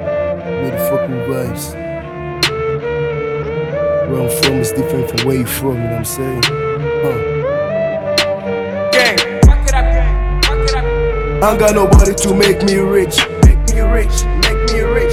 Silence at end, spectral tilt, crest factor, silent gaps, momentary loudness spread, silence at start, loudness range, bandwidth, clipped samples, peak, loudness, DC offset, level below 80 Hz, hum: 0 s; -4.5 dB/octave; 14 dB; none; 9 LU; 0 s; 6 LU; 16.5 kHz; under 0.1%; 0 dBFS; -14 LUFS; under 0.1%; -18 dBFS; none